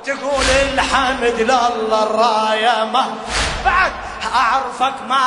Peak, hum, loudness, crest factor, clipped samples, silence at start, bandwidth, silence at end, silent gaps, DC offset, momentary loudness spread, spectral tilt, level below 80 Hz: -2 dBFS; none; -16 LUFS; 16 dB; under 0.1%; 0 s; 11 kHz; 0 s; none; under 0.1%; 5 LU; -2.5 dB/octave; -34 dBFS